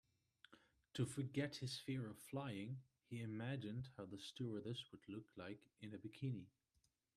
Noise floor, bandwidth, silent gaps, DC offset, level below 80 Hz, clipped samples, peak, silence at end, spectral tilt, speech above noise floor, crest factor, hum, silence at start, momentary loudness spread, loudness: -84 dBFS; 13.5 kHz; none; under 0.1%; -82 dBFS; under 0.1%; -30 dBFS; 0.7 s; -6 dB/octave; 36 dB; 20 dB; none; 0.5 s; 11 LU; -50 LUFS